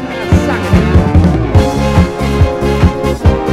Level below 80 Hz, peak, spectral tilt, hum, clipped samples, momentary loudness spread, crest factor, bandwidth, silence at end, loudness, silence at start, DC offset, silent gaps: -16 dBFS; 0 dBFS; -7.5 dB/octave; none; 2%; 3 LU; 10 dB; 13.5 kHz; 0 s; -11 LUFS; 0 s; under 0.1%; none